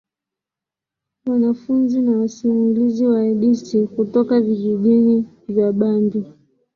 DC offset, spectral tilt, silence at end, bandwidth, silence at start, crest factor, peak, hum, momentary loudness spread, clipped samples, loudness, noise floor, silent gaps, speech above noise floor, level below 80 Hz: under 0.1%; -8.5 dB/octave; 0.45 s; 7 kHz; 1.25 s; 14 dB; -4 dBFS; none; 6 LU; under 0.1%; -18 LUFS; -87 dBFS; none; 71 dB; -62 dBFS